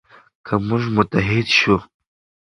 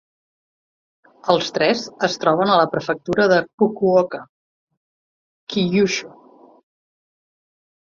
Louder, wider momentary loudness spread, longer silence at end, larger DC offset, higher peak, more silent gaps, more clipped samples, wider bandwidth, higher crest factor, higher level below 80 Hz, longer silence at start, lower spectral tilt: about the same, -18 LUFS vs -19 LUFS; second, 7 LU vs 10 LU; second, 0.55 s vs 1.85 s; neither; about the same, 0 dBFS vs 0 dBFS; second, none vs 3.53-3.58 s, 4.29-4.67 s, 4.77-5.47 s; neither; first, 11 kHz vs 7.4 kHz; about the same, 20 dB vs 22 dB; first, -44 dBFS vs -62 dBFS; second, 0.45 s vs 1.25 s; about the same, -5.5 dB/octave vs -5 dB/octave